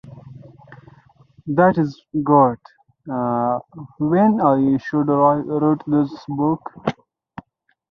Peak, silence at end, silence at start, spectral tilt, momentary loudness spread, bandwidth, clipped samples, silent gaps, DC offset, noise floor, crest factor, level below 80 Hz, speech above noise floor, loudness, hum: -2 dBFS; 1 s; 0.05 s; -10 dB/octave; 12 LU; 6.2 kHz; under 0.1%; none; under 0.1%; -62 dBFS; 18 dB; -58 dBFS; 44 dB; -19 LUFS; none